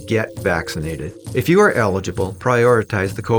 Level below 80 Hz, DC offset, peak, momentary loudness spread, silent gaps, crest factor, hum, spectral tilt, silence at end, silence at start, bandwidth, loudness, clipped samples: -46 dBFS; under 0.1%; -2 dBFS; 12 LU; none; 14 dB; none; -6 dB/octave; 0 s; 0 s; over 20 kHz; -18 LUFS; under 0.1%